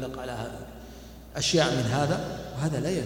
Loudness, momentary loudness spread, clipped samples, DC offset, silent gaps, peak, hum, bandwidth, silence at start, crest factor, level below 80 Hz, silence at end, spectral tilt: -28 LUFS; 21 LU; under 0.1%; under 0.1%; none; -10 dBFS; none; 18 kHz; 0 s; 18 dB; -48 dBFS; 0 s; -4.5 dB/octave